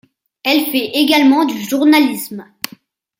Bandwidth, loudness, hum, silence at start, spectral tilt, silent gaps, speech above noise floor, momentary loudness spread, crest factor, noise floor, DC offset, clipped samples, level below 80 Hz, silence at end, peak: 16.5 kHz; -13 LUFS; none; 0.45 s; -3 dB/octave; none; 32 dB; 17 LU; 14 dB; -45 dBFS; under 0.1%; under 0.1%; -64 dBFS; 0.75 s; 0 dBFS